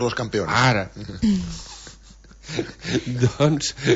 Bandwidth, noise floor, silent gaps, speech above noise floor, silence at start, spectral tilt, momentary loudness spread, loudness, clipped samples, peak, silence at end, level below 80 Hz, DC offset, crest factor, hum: 8 kHz; -46 dBFS; none; 25 dB; 0 s; -5 dB/octave; 17 LU; -22 LUFS; under 0.1%; -4 dBFS; 0 s; -44 dBFS; under 0.1%; 18 dB; none